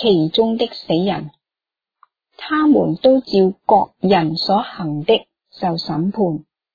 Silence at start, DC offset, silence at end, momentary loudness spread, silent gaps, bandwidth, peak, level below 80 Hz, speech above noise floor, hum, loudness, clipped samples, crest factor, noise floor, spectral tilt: 0 s; under 0.1%; 0.35 s; 9 LU; none; 5 kHz; -2 dBFS; -54 dBFS; 72 dB; none; -17 LUFS; under 0.1%; 16 dB; -89 dBFS; -8 dB/octave